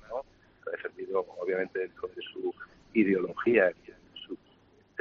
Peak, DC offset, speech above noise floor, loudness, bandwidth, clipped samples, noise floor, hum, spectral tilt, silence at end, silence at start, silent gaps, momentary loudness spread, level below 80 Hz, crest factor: -10 dBFS; under 0.1%; 33 dB; -31 LUFS; 6.4 kHz; under 0.1%; -62 dBFS; none; -4.5 dB/octave; 0.65 s; 0.1 s; none; 20 LU; -68 dBFS; 22 dB